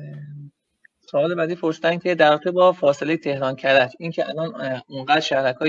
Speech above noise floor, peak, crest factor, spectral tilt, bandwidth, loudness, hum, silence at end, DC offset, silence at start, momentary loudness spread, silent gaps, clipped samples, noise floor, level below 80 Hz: 41 dB; -2 dBFS; 18 dB; -5.5 dB/octave; 7.6 kHz; -20 LUFS; none; 0 s; under 0.1%; 0 s; 12 LU; none; under 0.1%; -61 dBFS; -74 dBFS